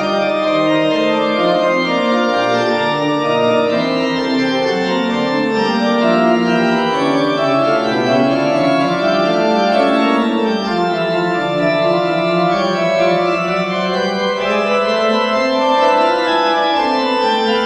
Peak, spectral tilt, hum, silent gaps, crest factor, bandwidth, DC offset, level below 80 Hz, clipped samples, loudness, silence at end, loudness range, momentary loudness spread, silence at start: -2 dBFS; -5.5 dB/octave; none; none; 14 dB; 10 kHz; under 0.1%; -54 dBFS; under 0.1%; -15 LUFS; 0 s; 1 LU; 3 LU; 0 s